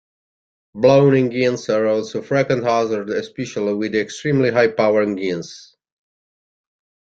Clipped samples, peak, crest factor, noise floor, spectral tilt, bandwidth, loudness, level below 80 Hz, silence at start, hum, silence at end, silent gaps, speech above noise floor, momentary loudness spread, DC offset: under 0.1%; -2 dBFS; 18 dB; under -90 dBFS; -6.5 dB/octave; 8 kHz; -18 LUFS; -60 dBFS; 0.75 s; none; 1.55 s; none; over 72 dB; 11 LU; under 0.1%